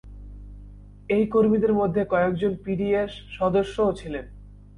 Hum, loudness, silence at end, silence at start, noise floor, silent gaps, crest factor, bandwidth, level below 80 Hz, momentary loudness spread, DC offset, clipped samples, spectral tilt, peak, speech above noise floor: 50 Hz at -40 dBFS; -23 LUFS; 0.2 s; 0.05 s; -44 dBFS; none; 14 dB; 10.5 kHz; -44 dBFS; 18 LU; under 0.1%; under 0.1%; -8 dB/octave; -10 dBFS; 21 dB